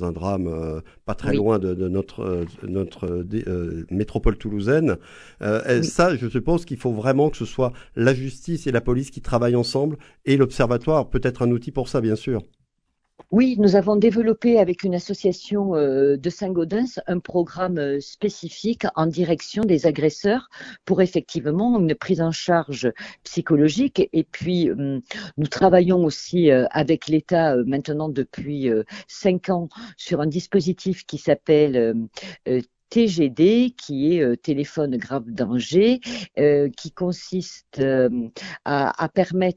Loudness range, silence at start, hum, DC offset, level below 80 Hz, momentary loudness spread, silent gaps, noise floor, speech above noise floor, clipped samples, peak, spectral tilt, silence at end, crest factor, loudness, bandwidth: 5 LU; 0 s; none; under 0.1%; -40 dBFS; 10 LU; none; -73 dBFS; 52 dB; under 0.1%; -2 dBFS; -7 dB/octave; 0.05 s; 20 dB; -22 LUFS; 11 kHz